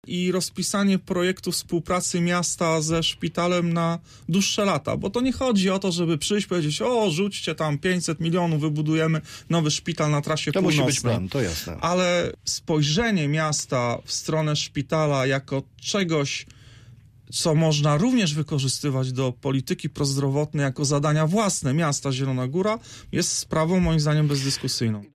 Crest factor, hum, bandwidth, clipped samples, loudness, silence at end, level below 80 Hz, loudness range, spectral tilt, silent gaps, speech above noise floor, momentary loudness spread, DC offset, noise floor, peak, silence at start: 12 dB; none; 15 kHz; under 0.1%; -23 LUFS; 0.1 s; -48 dBFS; 1 LU; -4.5 dB/octave; none; 26 dB; 5 LU; under 0.1%; -49 dBFS; -10 dBFS; 0.05 s